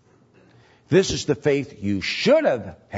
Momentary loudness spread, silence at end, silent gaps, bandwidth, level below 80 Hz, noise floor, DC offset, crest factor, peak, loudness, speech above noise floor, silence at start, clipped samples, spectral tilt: 8 LU; 0 s; none; 8 kHz; -50 dBFS; -55 dBFS; under 0.1%; 18 dB; -4 dBFS; -21 LUFS; 34 dB; 0.9 s; under 0.1%; -5 dB/octave